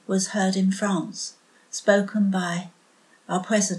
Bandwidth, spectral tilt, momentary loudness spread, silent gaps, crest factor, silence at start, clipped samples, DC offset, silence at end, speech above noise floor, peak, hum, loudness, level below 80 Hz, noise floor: 12 kHz; -4.5 dB/octave; 13 LU; none; 20 dB; 0.1 s; under 0.1%; under 0.1%; 0 s; 35 dB; -4 dBFS; none; -24 LUFS; -80 dBFS; -58 dBFS